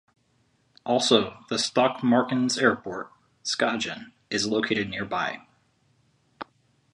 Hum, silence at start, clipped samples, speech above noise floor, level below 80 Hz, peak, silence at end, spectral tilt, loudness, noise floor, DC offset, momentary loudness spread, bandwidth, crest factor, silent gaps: none; 0.85 s; under 0.1%; 42 dB; -64 dBFS; -4 dBFS; 0.5 s; -3.5 dB/octave; -25 LUFS; -67 dBFS; under 0.1%; 19 LU; 11.5 kHz; 24 dB; none